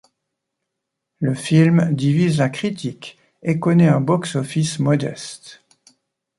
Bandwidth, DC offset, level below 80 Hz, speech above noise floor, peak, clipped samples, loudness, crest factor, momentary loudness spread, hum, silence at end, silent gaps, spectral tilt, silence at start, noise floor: 11.5 kHz; under 0.1%; -58 dBFS; 62 dB; -2 dBFS; under 0.1%; -18 LUFS; 16 dB; 17 LU; none; 0.85 s; none; -6.5 dB/octave; 1.2 s; -80 dBFS